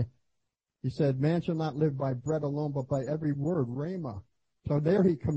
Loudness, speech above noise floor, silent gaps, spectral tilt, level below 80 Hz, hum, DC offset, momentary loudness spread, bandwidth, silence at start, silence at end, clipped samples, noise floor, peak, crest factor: -30 LUFS; 53 dB; none; -9 dB/octave; -60 dBFS; none; under 0.1%; 12 LU; 8 kHz; 0 s; 0 s; under 0.1%; -82 dBFS; -14 dBFS; 16 dB